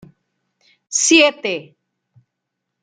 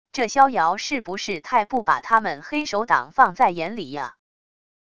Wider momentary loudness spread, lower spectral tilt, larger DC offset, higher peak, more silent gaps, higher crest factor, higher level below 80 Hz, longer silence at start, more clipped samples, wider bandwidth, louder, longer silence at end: first, 14 LU vs 11 LU; second, -1 dB/octave vs -3.5 dB/octave; second, under 0.1% vs 0.5%; about the same, 0 dBFS vs -2 dBFS; neither; about the same, 20 dB vs 20 dB; second, -66 dBFS vs -60 dBFS; first, 0.9 s vs 0.15 s; neither; about the same, 10 kHz vs 10 kHz; first, -15 LUFS vs -21 LUFS; first, 1.2 s vs 0.75 s